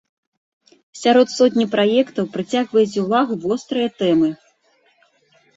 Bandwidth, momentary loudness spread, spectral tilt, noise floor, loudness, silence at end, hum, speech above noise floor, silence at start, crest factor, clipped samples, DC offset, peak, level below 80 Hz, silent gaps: 8 kHz; 7 LU; -5 dB/octave; -60 dBFS; -18 LUFS; 1.2 s; none; 43 dB; 0.95 s; 16 dB; under 0.1%; under 0.1%; -2 dBFS; -64 dBFS; none